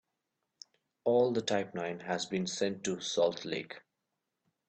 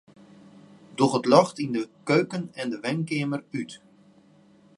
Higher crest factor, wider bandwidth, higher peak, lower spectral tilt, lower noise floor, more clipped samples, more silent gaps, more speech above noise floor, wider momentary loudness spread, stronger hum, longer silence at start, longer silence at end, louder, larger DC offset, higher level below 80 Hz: second, 18 dB vs 24 dB; second, 8.8 kHz vs 11.5 kHz; second, -16 dBFS vs -2 dBFS; second, -4 dB/octave vs -6 dB/octave; first, -86 dBFS vs -57 dBFS; neither; neither; first, 53 dB vs 32 dB; second, 10 LU vs 15 LU; neither; about the same, 1.05 s vs 1 s; about the same, 0.9 s vs 1 s; second, -33 LUFS vs -25 LUFS; neither; about the same, -76 dBFS vs -74 dBFS